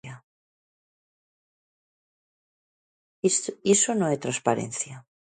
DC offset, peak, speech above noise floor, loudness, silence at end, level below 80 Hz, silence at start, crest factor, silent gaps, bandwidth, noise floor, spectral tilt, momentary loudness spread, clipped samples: under 0.1%; -6 dBFS; over 65 dB; -25 LUFS; 0.3 s; -72 dBFS; 0.05 s; 22 dB; 0.24-3.22 s; 9.6 kHz; under -90 dBFS; -3.5 dB/octave; 12 LU; under 0.1%